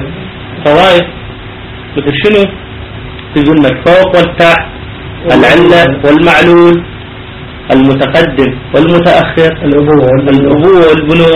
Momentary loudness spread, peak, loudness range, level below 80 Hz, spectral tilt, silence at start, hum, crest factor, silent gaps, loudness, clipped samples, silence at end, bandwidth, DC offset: 20 LU; 0 dBFS; 4 LU; -30 dBFS; -7 dB/octave; 0 s; none; 6 dB; none; -6 LUFS; 3%; 0 s; 10.5 kHz; under 0.1%